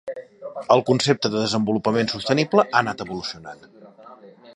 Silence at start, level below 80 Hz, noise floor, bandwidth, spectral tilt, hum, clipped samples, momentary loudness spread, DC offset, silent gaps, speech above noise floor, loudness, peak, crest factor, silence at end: 0.05 s; -60 dBFS; -45 dBFS; 11 kHz; -5 dB/octave; none; under 0.1%; 18 LU; under 0.1%; none; 24 dB; -21 LUFS; -2 dBFS; 22 dB; 0.05 s